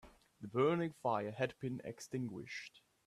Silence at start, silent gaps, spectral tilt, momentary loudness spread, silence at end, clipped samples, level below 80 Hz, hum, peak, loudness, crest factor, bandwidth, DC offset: 0.05 s; none; -6.5 dB/octave; 13 LU; 0.3 s; under 0.1%; -74 dBFS; none; -22 dBFS; -40 LUFS; 18 dB; 14 kHz; under 0.1%